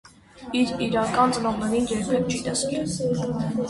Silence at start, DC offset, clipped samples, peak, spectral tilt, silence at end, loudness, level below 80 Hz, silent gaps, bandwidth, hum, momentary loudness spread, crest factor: 0.35 s; under 0.1%; under 0.1%; -8 dBFS; -5 dB/octave; 0 s; -24 LUFS; -50 dBFS; none; 11.5 kHz; none; 5 LU; 16 dB